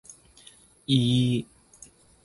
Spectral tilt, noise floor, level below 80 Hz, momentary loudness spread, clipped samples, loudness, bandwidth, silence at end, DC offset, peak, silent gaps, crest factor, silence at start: -6 dB/octave; -54 dBFS; -58 dBFS; 21 LU; under 0.1%; -24 LUFS; 11.5 kHz; 0.8 s; under 0.1%; -8 dBFS; none; 20 dB; 0.9 s